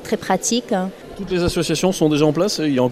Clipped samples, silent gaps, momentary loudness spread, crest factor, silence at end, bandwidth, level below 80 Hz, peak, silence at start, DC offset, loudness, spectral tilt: under 0.1%; none; 7 LU; 16 dB; 0 s; 15.5 kHz; -40 dBFS; -4 dBFS; 0 s; under 0.1%; -19 LUFS; -4.5 dB/octave